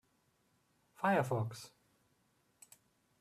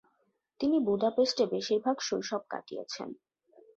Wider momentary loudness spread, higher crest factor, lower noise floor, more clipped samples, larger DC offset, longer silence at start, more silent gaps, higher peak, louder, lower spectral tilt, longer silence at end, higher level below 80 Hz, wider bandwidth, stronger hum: first, 20 LU vs 13 LU; first, 22 dB vs 16 dB; about the same, -76 dBFS vs -75 dBFS; neither; neither; first, 1 s vs 0.6 s; neither; about the same, -18 dBFS vs -16 dBFS; second, -36 LUFS vs -31 LUFS; first, -6.5 dB/octave vs -4 dB/octave; first, 1.55 s vs 0.65 s; second, -80 dBFS vs -72 dBFS; first, 14.5 kHz vs 7.8 kHz; neither